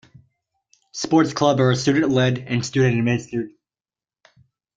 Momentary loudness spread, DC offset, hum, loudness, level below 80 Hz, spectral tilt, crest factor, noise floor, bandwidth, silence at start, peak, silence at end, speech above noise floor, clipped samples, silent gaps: 12 LU; under 0.1%; none; -20 LUFS; -58 dBFS; -6 dB/octave; 18 dB; under -90 dBFS; 7.8 kHz; 0.95 s; -4 dBFS; 1.25 s; over 71 dB; under 0.1%; none